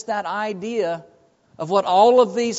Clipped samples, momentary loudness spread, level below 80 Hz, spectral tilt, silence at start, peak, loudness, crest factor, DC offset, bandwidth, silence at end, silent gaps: under 0.1%; 13 LU; -70 dBFS; -3 dB/octave; 0.05 s; -4 dBFS; -19 LUFS; 16 dB; under 0.1%; 8 kHz; 0 s; none